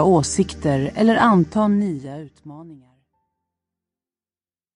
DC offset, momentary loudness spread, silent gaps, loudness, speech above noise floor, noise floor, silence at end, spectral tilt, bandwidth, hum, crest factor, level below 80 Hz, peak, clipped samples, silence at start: under 0.1%; 21 LU; none; -18 LUFS; over 71 dB; under -90 dBFS; 2 s; -6 dB/octave; 11 kHz; none; 18 dB; -48 dBFS; -4 dBFS; under 0.1%; 0 s